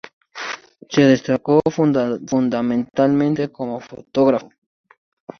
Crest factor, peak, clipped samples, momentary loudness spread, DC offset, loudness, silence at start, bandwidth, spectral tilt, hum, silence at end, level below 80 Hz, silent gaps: 18 dB; -2 dBFS; under 0.1%; 14 LU; under 0.1%; -19 LUFS; 0.05 s; 6.6 kHz; -6.5 dB/octave; none; 0.95 s; -58 dBFS; 0.13-0.21 s